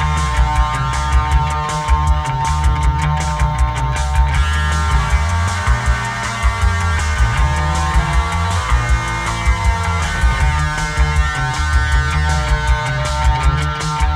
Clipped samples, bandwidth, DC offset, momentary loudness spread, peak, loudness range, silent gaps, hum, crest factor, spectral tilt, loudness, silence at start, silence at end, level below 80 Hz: under 0.1%; 12 kHz; under 0.1%; 2 LU; -2 dBFS; 0 LU; none; none; 14 dB; -4.5 dB/octave; -17 LUFS; 0 s; 0 s; -18 dBFS